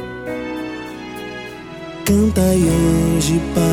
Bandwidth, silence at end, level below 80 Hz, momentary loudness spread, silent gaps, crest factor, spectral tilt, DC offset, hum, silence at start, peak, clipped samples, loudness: 19 kHz; 0 s; -32 dBFS; 16 LU; none; 14 dB; -6 dB/octave; under 0.1%; none; 0 s; -4 dBFS; under 0.1%; -17 LUFS